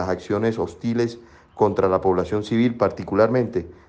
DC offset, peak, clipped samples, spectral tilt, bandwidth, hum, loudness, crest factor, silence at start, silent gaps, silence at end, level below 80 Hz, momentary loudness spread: under 0.1%; -6 dBFS; under 0.1%; -7.5 dB/octave; 8.6 kHz; none; -22 LUFS; 16 dB; 0 s; none; 0.15 s; -50 dBFS; 6 LU